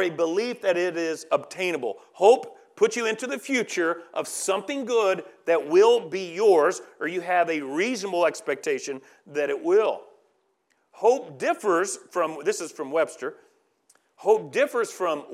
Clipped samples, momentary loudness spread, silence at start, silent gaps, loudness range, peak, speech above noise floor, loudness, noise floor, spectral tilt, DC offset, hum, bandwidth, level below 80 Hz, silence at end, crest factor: under 0.1%; 11 LU; 0 s; none; 4 LU; -4 dBFS; 46 dB; -24 LUFS; -70 dBFS; -3.5 dB/octave; under 0.1%; none; 14.5 kHz; under -90 dBFS; 0 s; 20 dB